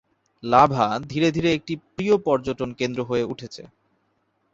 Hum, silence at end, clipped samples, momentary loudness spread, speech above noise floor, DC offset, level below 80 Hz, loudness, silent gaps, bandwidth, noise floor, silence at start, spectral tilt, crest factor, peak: none; 0.85 s; under 0.1%; 17 LU; 47 dB; under 0.1%; -54 dBFS; -22 LUFS; none; 7.8 kHz; -69 dBFS; 0.45 s; -6 dB/octave; 22 dB; -2 dBFS